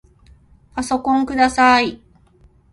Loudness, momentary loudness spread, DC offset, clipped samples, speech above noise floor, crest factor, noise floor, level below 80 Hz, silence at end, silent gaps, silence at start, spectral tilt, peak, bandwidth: -16 LUFS; 13 LU; under 0.1%; under 0.1%; 36 dB; 18 dB; -52 dBFS; -46 dBFS; 0.8 s; none; 0.75 s; -3.5 dB/octave; -2 dBFS; 11.5 kHz